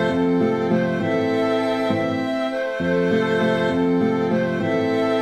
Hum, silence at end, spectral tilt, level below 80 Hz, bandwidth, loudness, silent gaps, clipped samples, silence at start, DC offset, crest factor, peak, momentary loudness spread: none; 0 s; -7 dB/octave; -56 dBFS; 10.5 kHz; -21 LUFS; none; under 0.1%; 0 s; under 0.1%; 12 dB; -8 dBFS; 3 LU